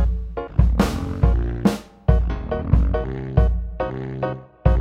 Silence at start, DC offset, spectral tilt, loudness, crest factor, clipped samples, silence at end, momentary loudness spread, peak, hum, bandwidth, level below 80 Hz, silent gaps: 0 s; under 0.1%; -8 dB/octave; -22 LUFS; 16 dB; under 0.1%; 0 s; 7 LU; -2 dBFS; none; 11 kHz; -22 dBFS; none